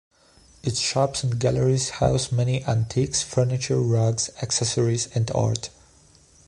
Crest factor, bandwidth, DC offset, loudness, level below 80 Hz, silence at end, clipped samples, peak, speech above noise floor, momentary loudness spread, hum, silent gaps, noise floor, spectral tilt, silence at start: 18 dB; 11.5 kHz; under 0.1%; -23 LUFS; -46 dBFS; 0.8 s; under 0.1%; -6 dBFS; 32 dB; 4 LU; none; none; -55 dBFS; -5 dB/octave; 0.65 s